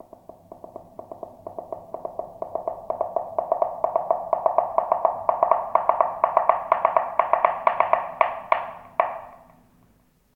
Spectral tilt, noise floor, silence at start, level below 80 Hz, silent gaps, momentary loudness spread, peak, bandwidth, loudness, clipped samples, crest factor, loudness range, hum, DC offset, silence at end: -6 dB/octave; -61 dBFS; 0.5 s; -62 dBFS; none; 18 LU; 0 dBFS; 4.3 kHz; -24 LUFS; under 0.1%; 24 dB; 9 LU; none; under 0.1%; 1 s